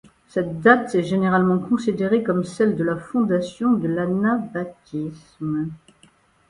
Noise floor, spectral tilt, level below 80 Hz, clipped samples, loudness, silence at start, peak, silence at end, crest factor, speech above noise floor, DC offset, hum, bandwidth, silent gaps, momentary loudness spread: -57 dBFS; -7.5 dB/octave; -58 dBFS; under 0.1%; -21 LUFS; 0.35 s; 0 dBFS; 0.75 s; 20 dB; 36 dB; under 0.1%; none; 11 kHz; none; 13 LU